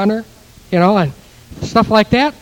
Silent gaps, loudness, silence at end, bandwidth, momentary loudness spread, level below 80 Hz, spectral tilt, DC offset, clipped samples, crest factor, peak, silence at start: none; -14 LUFS; 0.1 s; 16.5 kHz; 10 LU; -40 dBFS; -6.5 dB/octave; under 0.1%; under 0.1%; 16 dB; 0 dBFS; 0 s